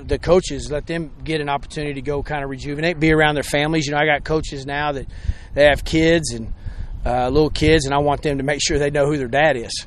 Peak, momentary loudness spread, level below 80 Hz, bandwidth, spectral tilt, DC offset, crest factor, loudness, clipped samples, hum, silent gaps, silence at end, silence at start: 0 dBFS; 11 LU; -32 dBFS; 13.5 kHz; -5 dB/octave; under 0.1%; 18 dB; -19 LUFS; under 0.1%; none; none; 0 s; 0 s